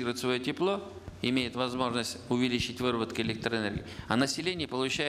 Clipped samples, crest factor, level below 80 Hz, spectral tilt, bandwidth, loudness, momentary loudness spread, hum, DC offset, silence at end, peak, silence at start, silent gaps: under 0.1%; 20 dB; -56 dBFS; -4.5 dB/octave; 14.5 kHz; -31 LUFS; 5 LU; none; under 0.1%; 0 s; -12 dBFS; 0 s; none